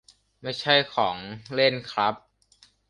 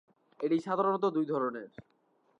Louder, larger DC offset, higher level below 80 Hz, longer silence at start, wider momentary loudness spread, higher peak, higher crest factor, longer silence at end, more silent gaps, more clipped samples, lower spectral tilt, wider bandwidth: first, -24 LUFS vs -31 LUFS; neither; first, -64 dBFS vs -78 dBFS; about the same, 0.45 s vs 0.4 s; about the same, 15 LU vs 13 LU; first, -4 dBFS vs -18 dBFS; first, 22 dB vs 16 dB; about the same, 0.7 s vs 0.6 s; neither; neither; second, -4.5 dB/octave vs -7.5 dB/octave; first, 11 kHz vs 8.6 kHz